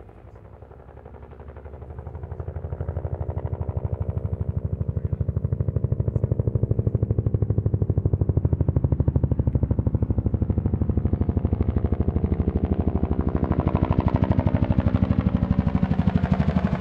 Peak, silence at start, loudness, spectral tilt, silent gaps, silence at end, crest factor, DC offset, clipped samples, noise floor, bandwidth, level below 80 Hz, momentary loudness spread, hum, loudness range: -4 dBFS; 0 s; -24 LUFS; -11.5 dB/octave; none; 0 s; 18 dB; under 0.1%; under 0.1%; -44 dBFS; 4.6 kHz; -30 dBFS; 12 LU; none; 9 LU